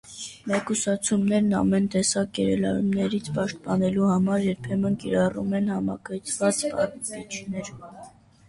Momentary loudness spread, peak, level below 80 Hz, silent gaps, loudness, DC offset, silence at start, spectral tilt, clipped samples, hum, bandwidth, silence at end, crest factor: 12 LU; -10 dBFS; -54 dBFS; none; -25 LUFS; under 0.1%; 0.05 s; -5 dB/octave; under 0.1%; none; 11.5 kHz; 0.4 s; 16 dB